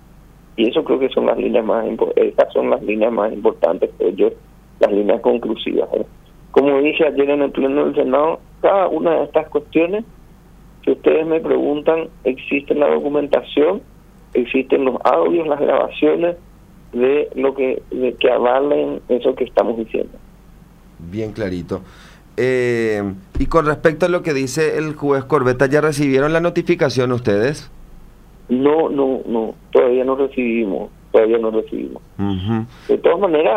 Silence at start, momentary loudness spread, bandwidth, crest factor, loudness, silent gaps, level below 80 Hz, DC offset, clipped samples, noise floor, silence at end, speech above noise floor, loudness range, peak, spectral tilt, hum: 0.6 s; 8 LU; 13.5 kHz; 16 dB; -17 LUFS; none; -40 dBFS; under 0.1%; under 0.1%; -44 dBFS; 0 s; 27 dB; 3 LU; 0 dBFS; -6.5 dB/octave; none